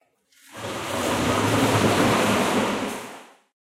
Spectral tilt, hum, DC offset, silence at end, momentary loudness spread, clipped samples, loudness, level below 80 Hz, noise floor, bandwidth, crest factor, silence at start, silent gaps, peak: -4.5 dB/octave; none; under 0.1%; 0.35 s; 14 LU; under 0.1%; -22 LUFS; -50 dBFS; -57 dBFS; 16 kHz; 16 dB; 0.5 s; none; -8 dBFS